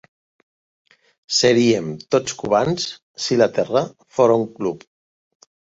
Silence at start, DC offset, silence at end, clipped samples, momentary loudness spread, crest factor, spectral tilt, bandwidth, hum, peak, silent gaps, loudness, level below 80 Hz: 1.3 s; under 0.1%; 1 s; under 0.1%; 11 LU; 18 dB; -4.5 dB/octave; 8 kHz; none; -2 dBFS; 3.02-3.14 s; -19 LUFS; -60 dBFS